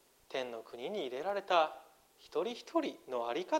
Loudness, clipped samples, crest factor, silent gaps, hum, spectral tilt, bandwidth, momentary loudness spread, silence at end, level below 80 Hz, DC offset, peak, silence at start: -37 LUFS; under 0.1%; 22 dB; none; none; -3.5 dB/octave; 16 kHz; 12 LU; 0 s; -82 dBFS; under 0.1%; -16 dBFS; 0.3 s